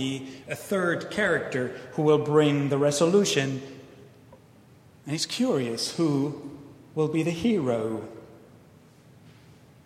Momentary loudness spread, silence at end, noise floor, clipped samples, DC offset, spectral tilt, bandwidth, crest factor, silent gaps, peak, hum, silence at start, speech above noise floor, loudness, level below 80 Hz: 18 LU; 0.55 s; -54 dBFS; under 0.1%; under 0.1%; -5 dB/octave; 15.5 kHz; 20 dB; none; -8 dBFS; none; 0 s; 29 dB; -26 LUFS; -64 dBFS